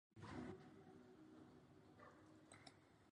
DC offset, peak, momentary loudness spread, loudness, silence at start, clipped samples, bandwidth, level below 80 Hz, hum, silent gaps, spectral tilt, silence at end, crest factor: under 0.1%; -42 dBFS; 12 LU; -62 LUFS; 0.1 s; under 0.1%; 10 kHz; -78 dBFS; none; none; -6 dB/octave; 0 s; 20 dB